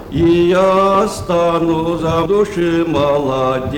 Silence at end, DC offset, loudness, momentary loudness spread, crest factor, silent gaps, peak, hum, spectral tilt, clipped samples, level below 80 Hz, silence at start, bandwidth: 0 s; under 0.1%; -14 LUFS; 5 LU; 10 dB; none; -4 dBFS; none; -6.5 dB/octave; under 0.1%; -36 dBFS; 0 s; 16.5 kHz